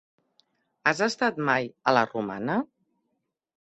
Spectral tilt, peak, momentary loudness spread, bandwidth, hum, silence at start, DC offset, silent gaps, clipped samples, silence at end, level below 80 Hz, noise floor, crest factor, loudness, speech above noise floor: -4.5 dB/octave; -6 dBFS; 7 LU; 8.4 kHz; none; 0.85 s; under 0.1%; none; under 0.1%; 1.05 s; -70 dBFS; -79 dBFS; 24 dB; -26 LUFS; 53 dB